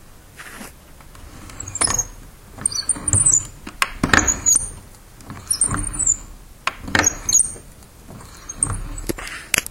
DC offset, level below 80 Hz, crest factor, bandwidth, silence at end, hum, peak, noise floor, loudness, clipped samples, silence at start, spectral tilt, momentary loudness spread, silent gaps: under 0.1%; -36 dBFS; 22 dB; 17 kHz; 0 s; none; 0 dBFS; -42 dBFS; -18 LUFS; under 0.1%; 0.1 s; -1.5 dB/octave; 23 LU; none